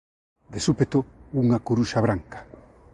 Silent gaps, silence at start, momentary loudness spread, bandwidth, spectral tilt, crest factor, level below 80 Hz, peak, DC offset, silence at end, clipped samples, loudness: none; 0.5 s; 16 LU; 11 kHz; -6.5 dB/octave; 18 dB; -50 dBFS; -6 dBFS; under 0.1%; 0.5 s; under 0.1%; -24 LUFS